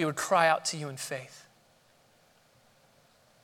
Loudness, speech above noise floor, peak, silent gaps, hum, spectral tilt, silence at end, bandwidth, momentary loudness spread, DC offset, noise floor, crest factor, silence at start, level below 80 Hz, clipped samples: -28 LUFS; 35 dB; -10 dBFS; none; none; -3 dB/octave; 2.05 s; 18 kHz; 15 LU; under 0.1%; -64 dBFS; 24 dB; 0 s; -82 dBFS; under 0.1%